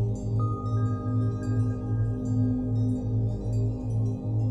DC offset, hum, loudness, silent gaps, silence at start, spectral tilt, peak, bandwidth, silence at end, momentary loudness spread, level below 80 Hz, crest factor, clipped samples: under 0.1%; 50 Hz at -40 dBFS; -28 LUFS; none; 0 s; -10 dB/octave; -16 dBFS; 7.8 kHz; 0 s; 2 LU; -40 dBFS; 10 dB; under 0.1%